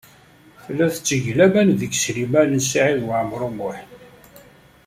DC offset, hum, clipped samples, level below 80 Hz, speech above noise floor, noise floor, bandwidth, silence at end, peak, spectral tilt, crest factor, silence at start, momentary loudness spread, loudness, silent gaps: under 0.1%; none; under 0.1%; -56 dBFS; 31 dB; -49 dBFS; 16 kHz; 0.45 s; -2 dBFS; -4.5 dB/octave; 18 dB; 0.65 s; 13 LU; -19 LUFS; none